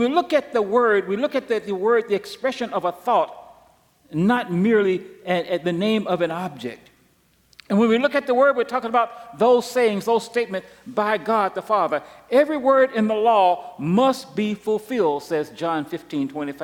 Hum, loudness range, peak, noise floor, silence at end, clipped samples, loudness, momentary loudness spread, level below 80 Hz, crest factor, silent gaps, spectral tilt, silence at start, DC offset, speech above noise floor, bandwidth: none; 4 LU; -6 dBFS; -60 dBFS; 0 s; under 0.1%; -21 LUFS; 9 LU; -66 dBFS; 14 dB; none; -6 dB/octave; 0 s; under 0.1%; 40 dB; 17.5 kHz